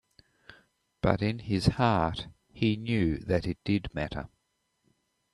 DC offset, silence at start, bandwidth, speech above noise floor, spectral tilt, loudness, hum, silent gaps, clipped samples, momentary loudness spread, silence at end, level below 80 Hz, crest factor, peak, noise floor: under 0.1%; 1.05 s; 11.5 kHz; 49 dB; -7 dB/octave; -29 LUFS; none; none; under 0.1%; 12 LU; 1.05 s; -48 dBFS; 24 dB; -6 dBFS; -77 dBFS